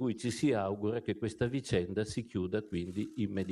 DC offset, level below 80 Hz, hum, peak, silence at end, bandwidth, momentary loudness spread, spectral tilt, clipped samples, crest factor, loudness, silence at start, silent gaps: under 0.1%; -60 dBFS; none; -16 dBFS; 0 s; 12.5 kHz; 6 LU; -6.5 dB/octave; under 0.1%; 18 dB; -35 LUFS; 0 s; none